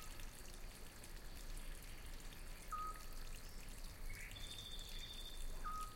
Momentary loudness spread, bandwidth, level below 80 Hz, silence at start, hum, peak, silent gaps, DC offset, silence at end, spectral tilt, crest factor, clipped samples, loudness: 7 LU; 16.5 kHz; -50 dBFS; 0 s; none; -36 dBFS; none; under 0.1%; 0 s; -2.5 dB/octave; 14 dB; under 0.1%; -53 LUFS